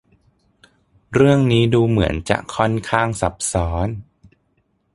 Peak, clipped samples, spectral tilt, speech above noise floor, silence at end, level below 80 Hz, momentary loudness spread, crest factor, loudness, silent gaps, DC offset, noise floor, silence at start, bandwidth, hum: 0 dBFS; under 0.1%; -6 dB/octave; 48 dB; 0.95 s; -36 dBFS; 9 LU; 20 dB; -18 LUFS; none; under 0.1%; -65 dBFS; 1.1 s; 11.5 kHz; none